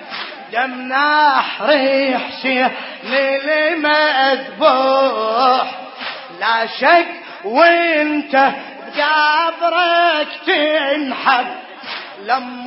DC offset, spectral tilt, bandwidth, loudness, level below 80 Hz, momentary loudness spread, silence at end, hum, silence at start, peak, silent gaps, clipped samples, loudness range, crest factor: under 0.1%; -6.5 dB/octave; 5.8 kHz; -15 LUFS; -72 dBFS; 14 LU; 0 s; none; 0 s; 0 dBFS; none; under 0.1%; 1 LU; 16 dB